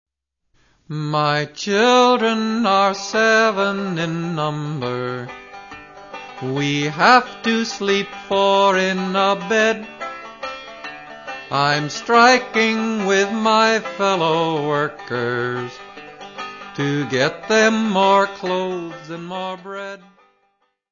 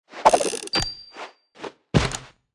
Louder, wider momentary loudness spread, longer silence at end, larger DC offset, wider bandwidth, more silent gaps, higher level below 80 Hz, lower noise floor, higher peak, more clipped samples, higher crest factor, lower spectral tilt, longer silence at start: first, -18 LUFS vs -22 LUFS; second, 18 LU vs 21 LU; first, 0.95 s vs 0.3 s; neither; second, 7.4 kHz vs 12 kHz; neither; second, -62 dBFS vs -42 dBFS; first, -68 dBFS vs -42 dBFS; about the same, 0 dBFS vs 0 dBFS; neither; second, 18 dB vs 24 dB; about the same, -4.5 dB/octave vs -4 dB/octave; first, 0.9 s vs 0.15 s